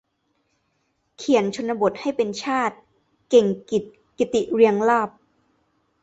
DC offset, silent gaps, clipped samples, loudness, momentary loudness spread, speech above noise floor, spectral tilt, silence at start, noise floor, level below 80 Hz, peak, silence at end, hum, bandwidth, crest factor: under 0.1%; none; under 0.1%; -21 LUFS; 9 LU; 50 dB; -5 dB/octave; 1.2 s; -71 dBFS; -64 dBFS; -4 dBFS; 0.95 s; none; 8 kHz; 20 dB